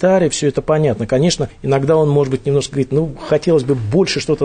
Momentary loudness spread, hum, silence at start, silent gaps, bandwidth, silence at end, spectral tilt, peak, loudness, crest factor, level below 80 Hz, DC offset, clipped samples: 4 LU; none; 0 s; none; 9.6 kHz; 0 s; -6 dB/octave; -4 dBFS; -16 LUFS; 12 dB; -42 dBFS; under 0.1%; under 0.1%